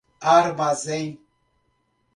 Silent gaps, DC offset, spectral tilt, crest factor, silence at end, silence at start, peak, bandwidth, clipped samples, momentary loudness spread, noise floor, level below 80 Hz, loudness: none; under 0.1%; -4.5 dB/octave; 20 dB; 1 s; 0.2 s; -4 dBFS; 11.5 kHz; under 0.1%; 12 LU; -69 dBFS; -66 dBFS; -21 LUFS